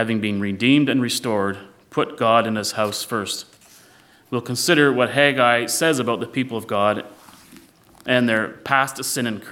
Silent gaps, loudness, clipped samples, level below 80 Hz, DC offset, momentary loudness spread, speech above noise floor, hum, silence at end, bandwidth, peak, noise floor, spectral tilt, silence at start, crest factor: none; -20 LUFS; under 0.1%; -68 dBFS; under 0.1%; 12 LU; 32 dB; none; 0 s; 17 kHz; -2 dBFS; -52 dBFS; -4 dB/octave; 0 s; 20 dB